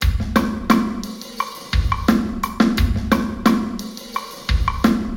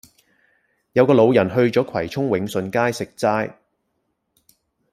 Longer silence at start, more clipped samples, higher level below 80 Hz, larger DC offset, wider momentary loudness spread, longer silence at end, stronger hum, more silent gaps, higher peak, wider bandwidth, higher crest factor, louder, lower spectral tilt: second, 0 s vs 0.95 s; neither; first, -26 dBFS vs -60 dBFS; neither; about the same, 10 LU vs 9 LU; second, 0 s vs 1.4 s; neither; neither; about the same, 0 dBFS vs -2 dBFS; first, 17.5 kHz vs 15 kHz; about the same, 18 dB vs 18 dB; about the same, -20 LUFS vs -19 LUFS; about the same, -6 dB/octave vs -6.5 dB/octave